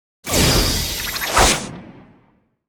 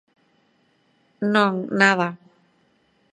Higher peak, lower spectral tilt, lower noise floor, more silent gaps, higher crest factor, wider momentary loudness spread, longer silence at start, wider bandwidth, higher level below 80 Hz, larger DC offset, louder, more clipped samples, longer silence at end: about the same, 0 dBFS vs -2 dBFS; second, -2.5 dB/octave vs -5 dB/octave; second, -59 dBFS vs -64 dBFS; neither; about the same, 20 dB vs 22 dB; about the same, 11 LU vs 10 LU; second, 0.25 s vs 1.2 s; first, over 20 kHz vs 10.5 kHz; first, -28 dBFS vs -74 dBFS; neither; first, -17 LUFS vs -20 LUFS; neither; second, 0.75 s vs 0.95 s